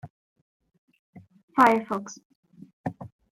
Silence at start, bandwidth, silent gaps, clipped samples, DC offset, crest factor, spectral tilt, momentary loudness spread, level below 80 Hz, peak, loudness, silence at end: 0.05 s; 16 kHz; 0.10-0.36 s, 0.42-0.60 s, 0.78-0.88 s, 0.99-1.13 s, 1.43-1.48 s, 2.25-2.43 s, 2.73-2.84 s; under 0.1%; under 0.1%; 24 dB; -5.5 dB/octave; 25 LU; -70 dBFS; -4 dBFS; -25 LUFS; 0.3 s